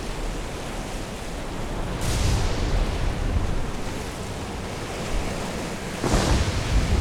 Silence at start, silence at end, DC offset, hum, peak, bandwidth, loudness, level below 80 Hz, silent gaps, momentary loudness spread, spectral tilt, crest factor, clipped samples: 0 s; 0 s; under 0.1%; none; -8 dBFS; 16.5 kHz; -28 LUFS; -28 dBFS; none; 9 LU; -5 dB/octave; 18 dB; under 0.1%